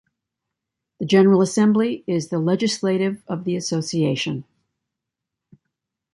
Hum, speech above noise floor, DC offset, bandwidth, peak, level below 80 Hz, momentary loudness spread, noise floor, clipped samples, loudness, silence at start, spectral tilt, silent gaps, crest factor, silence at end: none; 64 dB; under 0.1%; 11.5 kHz; -4 dBFS; -64 dBFS; 11 LU; -84 dBFS; under 0.1%; -20 LUFS; 1 s; -5.5 dB/octave; none; 18 dB; 1.75 s